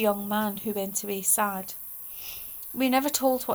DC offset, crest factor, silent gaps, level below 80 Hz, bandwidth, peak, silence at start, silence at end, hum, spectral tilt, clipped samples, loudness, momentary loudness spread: under 0.1%; 18 dB; none; -62 dBFS; over 20 kHz; -10 dBFS; 0 s; 0 s; none; -3 dB/octave; under 0.1%; -27 LUFS; 11 LU